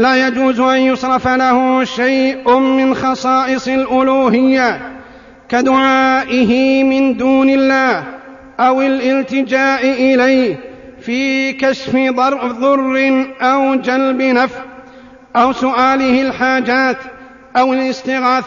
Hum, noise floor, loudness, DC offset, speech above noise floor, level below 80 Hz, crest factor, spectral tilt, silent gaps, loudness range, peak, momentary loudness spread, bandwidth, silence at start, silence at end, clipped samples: none; -39 dBFS; -13 LUFS; under 0.1%; 26 dB; -50 dBFS; 12 dB; -2.5 dB/octave; none; 2 LU; 0 dBFS; 6 LU; 7.4 kHz; 0 s; 0 s; under 0.1%